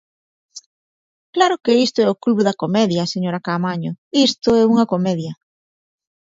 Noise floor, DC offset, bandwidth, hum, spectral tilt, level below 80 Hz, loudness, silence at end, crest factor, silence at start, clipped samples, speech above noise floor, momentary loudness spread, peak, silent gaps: under -90 dBFS; under 0.1%; 7.8 kHz; none; -5.5 dB/octave; -58 dBFS; -18 LUFS; 0.95 s; 18 dB; 0.55 s; under 0.1%; over 73 dB; 8 LU; 0 dBFS; 0.66-1.33 s, 3.98-4.11 s